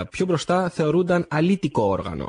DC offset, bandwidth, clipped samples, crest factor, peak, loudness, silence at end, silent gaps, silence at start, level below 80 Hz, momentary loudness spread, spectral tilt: under 0.1%; 10 kHz; under 0.1%; 12 dB; -10 dBFS; -22 LUFS; 0 s; none; 0 s; -48 dBFS; 3 LU; -6.5 dB/octave